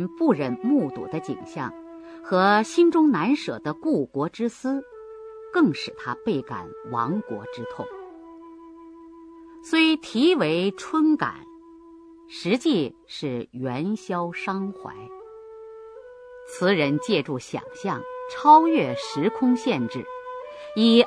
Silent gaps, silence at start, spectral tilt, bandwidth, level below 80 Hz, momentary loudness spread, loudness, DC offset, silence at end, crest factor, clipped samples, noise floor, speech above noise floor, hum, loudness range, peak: none; 0 s; -5.5 dB/octave; 11 kHz; -66 dBFS; 23 LU; -24 LUFS; under 0.1%; 0 s; 20 dB; under 0.1%; -47 dBFS; 25 dB; none; 9 LU; -4 dBFS